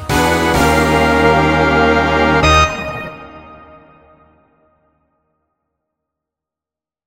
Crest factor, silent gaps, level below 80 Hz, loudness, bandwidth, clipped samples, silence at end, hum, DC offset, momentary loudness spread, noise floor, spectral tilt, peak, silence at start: 16 dB; none; -28 dBFS; -12 LUFS; 16.5 kHz; under 0.1%; 3.5 s; none; under 0.1%; 13 LU; -89 dBFS; -5 dB/octave; 0 dBFS; 0 s